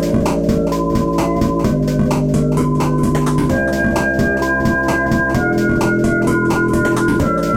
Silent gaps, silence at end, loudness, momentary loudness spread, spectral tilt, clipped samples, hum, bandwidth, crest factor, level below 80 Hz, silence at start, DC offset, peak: none; 0 s; -16 LUFS; 1 LU; -6.5 dB/octave; under 0.1%; none; 16.5 kHz; 10 dB; -30 dBFS; 0 s; under 0.1%; -4 dBFS